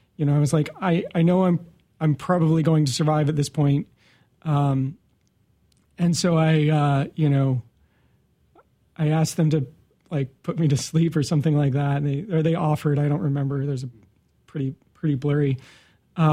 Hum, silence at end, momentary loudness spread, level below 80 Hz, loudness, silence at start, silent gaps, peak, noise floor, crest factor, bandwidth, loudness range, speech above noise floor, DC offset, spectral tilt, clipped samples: none; 0 s; 11 LU; -56 dBFS; -22 LUFS; 0.2 s; none; -6 dBFS; -64 dBFS; 16 dB; 13 kHz; 4 LU; 43 dB; under 0.1%; -7 dB/octave; under 0.1%